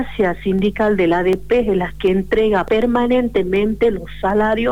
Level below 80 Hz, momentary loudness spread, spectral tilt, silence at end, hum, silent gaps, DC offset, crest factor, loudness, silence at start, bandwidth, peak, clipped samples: -36 dBFS; 3 LU; -7.5 dB/octave; 0 s; none; none; 2%; 10 dB; -17 LUFS; 0 s; 19.5 kHz; -6 dBFS; under 0.1%